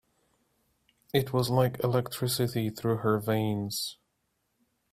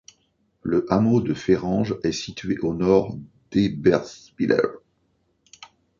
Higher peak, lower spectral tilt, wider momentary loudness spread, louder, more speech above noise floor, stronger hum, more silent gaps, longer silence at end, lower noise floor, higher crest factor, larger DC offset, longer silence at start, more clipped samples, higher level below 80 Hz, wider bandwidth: second, -10 dBFS vs -4 dBFS; about the same, -5.5 dB/octave vs -6.5 dB/octave; second, 5 LU vs 10 LU; second, -29 LUFS vs -22 LUFS; about the same, 49 dB vs 46 dB; neither; neither; first, 1 s vs 0.35 s; first, -77 dBFS vs -68 dBFS; about the same, 20 dB vs 20 dB; neither; first, 1.15 s vs 0.65 s; neither; second, -62 dBFS vs -50 dBFS; first, 16 kHz vs 7.4 kHz